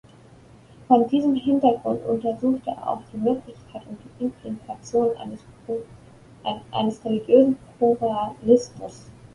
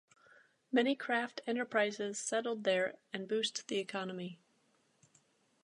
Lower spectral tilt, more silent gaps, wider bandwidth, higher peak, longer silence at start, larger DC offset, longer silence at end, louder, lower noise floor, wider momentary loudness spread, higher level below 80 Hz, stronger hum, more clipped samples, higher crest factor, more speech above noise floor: first, -7 dB/octave vs -3 dB/octave; neither; about the same, 11 kHz vs 11 kHz; first, -2 dBFS vs -18 dBFS; first, 0.9 s vs 0.7 s; neither; second, 0.25 s vs 1.3 s; first, -23 LUFS vs -36 LUFS; second, -49 dBFS vs -74 dBFS; first, 20 LU vs 8 LU; first, -58 dBFS vs under -90 dBFS; neither; neither; about the same, 20 dB vs 20 dB; second, 27 dB vs 38 dB